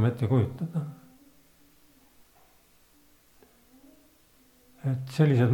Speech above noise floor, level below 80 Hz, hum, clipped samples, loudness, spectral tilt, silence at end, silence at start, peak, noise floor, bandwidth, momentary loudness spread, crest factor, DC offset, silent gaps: 36 dB; -66 dBFS; none; under 0.1%; -28 LUFS; -8.5 dB/octave; 0 s; 0 s; -10 dBFS; -61 dBFS; 18.5 kHz; 14 LU; 20 dB; under 0.1%; none